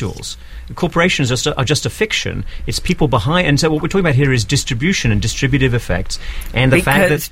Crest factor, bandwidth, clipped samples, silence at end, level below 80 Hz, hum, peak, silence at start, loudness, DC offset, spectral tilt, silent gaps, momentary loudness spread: 16 dB; 16 kHz; under 0.1%; 0 s; -28 dBFS; none; 0 dBFS; 0 s; -15 LUFS; under 0.1%; -5 dB/octave; none; 11 LU